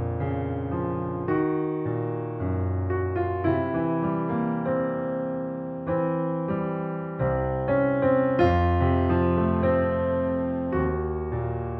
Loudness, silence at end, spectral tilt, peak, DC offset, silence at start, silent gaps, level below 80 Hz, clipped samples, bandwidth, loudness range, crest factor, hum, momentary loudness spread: -26 LUFS; 0 s; -11 dB/octave; -8 dBFS; under 0.1%; 0 s; none; -42 dBFS; under 0.1%; 5 kHz; 5 LU; 18 dB; none; 7 LU